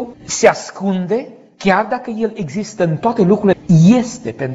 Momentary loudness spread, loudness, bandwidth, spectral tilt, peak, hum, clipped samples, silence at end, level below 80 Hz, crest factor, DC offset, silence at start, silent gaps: 13 LU; -15 LUFS; 8 kHz; -6 dB/octave; 0 dBFS; none; under 0.1%; 0 s; -50 dBFS; 16 dB; under 0.1%; 0 s; none